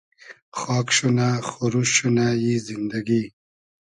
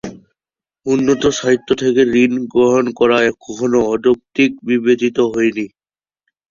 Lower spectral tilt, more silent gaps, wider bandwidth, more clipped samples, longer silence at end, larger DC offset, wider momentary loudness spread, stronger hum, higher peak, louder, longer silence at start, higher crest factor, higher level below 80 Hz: about the same, -4.5 dB/octave vs -5 dB/octave; first, 0.42-0.52 s vs none; first, 11 kHz vs 7.4 kHz; neither; second, 0.6 s vs 0.85 s; neither; first, 10 LU vs 6 LU; neither; about the same, -4 dBFS vs -2 dBFS; second, -22 LUFS vs -15 LUFS; first, 0.25 s vs 0.05 s; first, 20 dB vs 14 dB; second, -60 dBFS vs -50 dBFS